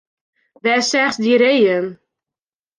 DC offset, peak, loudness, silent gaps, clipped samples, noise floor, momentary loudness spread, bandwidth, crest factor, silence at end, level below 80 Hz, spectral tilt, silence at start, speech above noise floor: under 0.1%; -4 dBFS; -15 LUFS; none; under 0.1%; -90 dBFS; 9 LU; 10 kHz; 14 dB; 0.85 s; -68 dBFS; -3.5 dB/octave; 0.65 s; 75 dB